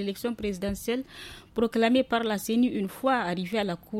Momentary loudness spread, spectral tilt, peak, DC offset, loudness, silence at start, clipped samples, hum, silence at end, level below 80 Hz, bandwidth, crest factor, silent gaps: 9 LU; -5 dB/octave; -12 dBFS; under 0.1%; -28 LUFS; 0 s; under 0.1%; none; 0 s; -54 dBFS; 16.5 kHz; 16 dB; none